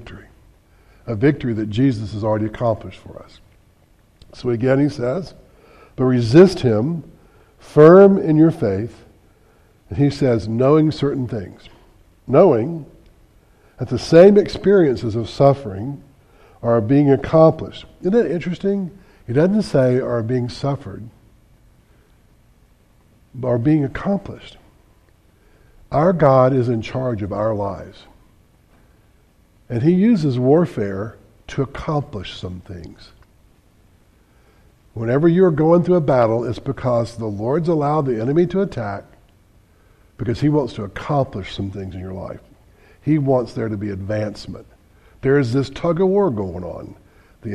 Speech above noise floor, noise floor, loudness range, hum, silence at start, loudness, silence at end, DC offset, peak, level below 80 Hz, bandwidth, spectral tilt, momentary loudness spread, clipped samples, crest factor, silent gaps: 37 dB; -54 dBFS; 9 LU; none; 0 s; -17 LUFS; 0 s; under 0.1%; 0 dBFS; -46 dBFS; 11 kHz; -8.5 dB/octave; 18 LU; under 0.1%; 18 dB; none